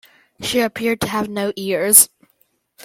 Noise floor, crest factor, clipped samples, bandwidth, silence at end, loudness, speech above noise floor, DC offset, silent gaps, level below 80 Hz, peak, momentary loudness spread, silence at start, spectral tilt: -63 dBFS; 20 dB; under 0.1%; 17 kHz; 0.8 s; -16 LUFS; 46 dB; under 0.1%; none; -54 dBFS; 0 dBFS; 13 LU; 0.4 s; -2 dB/octave